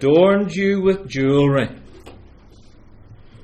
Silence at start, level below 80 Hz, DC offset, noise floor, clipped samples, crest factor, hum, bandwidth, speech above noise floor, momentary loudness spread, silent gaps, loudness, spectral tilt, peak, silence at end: 0 s; -46 dBFS; under 0.1%; -45 dBFS; under 0.1%; 14 dB; none; 8.8 kHz; 29 dB; 7 LU; none; -17 LUFS; -7.5 dB/octave; -4 dBFS; 0.3 s